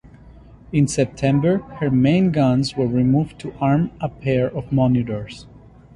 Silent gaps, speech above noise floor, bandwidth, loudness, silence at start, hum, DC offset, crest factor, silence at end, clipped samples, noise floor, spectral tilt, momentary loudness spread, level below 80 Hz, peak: none; 25 dB; 11.5 kHz; -20 LUFS; 0.7 s; none; under 0.1%; 16 dB; 0.5 s; under 0.1%; -44 dBFS; -7 dB/octave; 9 LU; -46 dBFS; -4 dBFS